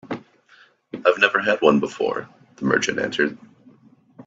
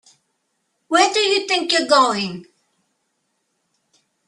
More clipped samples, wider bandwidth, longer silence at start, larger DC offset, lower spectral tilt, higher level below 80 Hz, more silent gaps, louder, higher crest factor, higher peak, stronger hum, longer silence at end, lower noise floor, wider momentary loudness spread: neither; second, 8 kHz vs 12 kHz; second, 0.05 s vs 0.9 s; neither; first, -4 dB/octave vs -2 dB/octave; about the same, -64 dBFS vs -68 dBFS; neither; second, -20 LUFS vs -17 LUFS; about the same, 22 dB vs 20 dB; about the same, 0 dBFS vs -2 dBFS; neither; second, 0.05 s vs 1.85 s; second, -55 dBFS vs -71 dBFS; first, 15 LU vs 11 LU